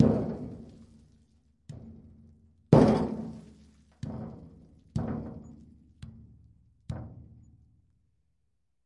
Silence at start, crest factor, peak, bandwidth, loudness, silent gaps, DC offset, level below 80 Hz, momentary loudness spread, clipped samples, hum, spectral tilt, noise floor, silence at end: 0 s; 28 dB; -4 dBFS; 10.5 kHz; -29 LUFS; none; under 0.1%; -52 dBFS; 28 LU; under 0.1%; none; -9 dB/octave; -79 dBFS; 1.7 s